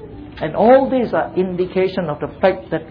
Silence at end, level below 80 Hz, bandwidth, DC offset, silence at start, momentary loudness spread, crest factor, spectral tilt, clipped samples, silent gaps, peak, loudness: 0 s; -44 dBFS; 5.2 kHz; under 0.1%; 0 s; 12 LU; 14 dB; -9.5 dB/octave; under 0.1%; none; -2 dBFS; -17 LUFS